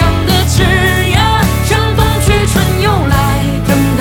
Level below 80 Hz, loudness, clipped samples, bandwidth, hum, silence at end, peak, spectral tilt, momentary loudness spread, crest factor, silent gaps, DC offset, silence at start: -18 dBFS; -11 LUFS; under 0.1%; 20 kHz; none; 0 s; 0 dBFS; -5 dB/octave; 2 LU; 10 dB; none; under 0.1%; 0 s